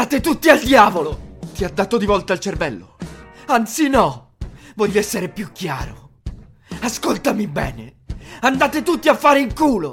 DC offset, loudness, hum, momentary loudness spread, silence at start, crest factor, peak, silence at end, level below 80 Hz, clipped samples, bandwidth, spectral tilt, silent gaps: under 0.1%; -17 LUFS; none; 22 LU; 0 s; 18 dB; 0 dBFS; 0 s; -38 dBFS; under 0.1%; 16.5 kHz; -4.5 dB/octave; none